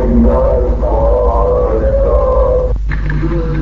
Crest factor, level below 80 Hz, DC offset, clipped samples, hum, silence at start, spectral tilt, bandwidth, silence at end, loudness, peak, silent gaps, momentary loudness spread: 10 dB; -14 dBFS; 2%; under 0.1%; none; 0 s; -10 dB/octave; 4.4 kHz; 0 s; -13 LUFS; 0 dBFS; none; 6 LU